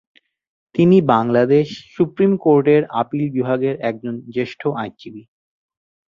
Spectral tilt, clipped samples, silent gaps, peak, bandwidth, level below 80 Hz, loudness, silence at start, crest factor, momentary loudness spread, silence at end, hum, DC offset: -9 dB/octave; under 0.1%; none; 0 dBFS; 7.2 kHz; -58 dBFS; -18 LUFS; 0.75 s; 18 dB; 13 LU; 0.95 s; none; under 0.1%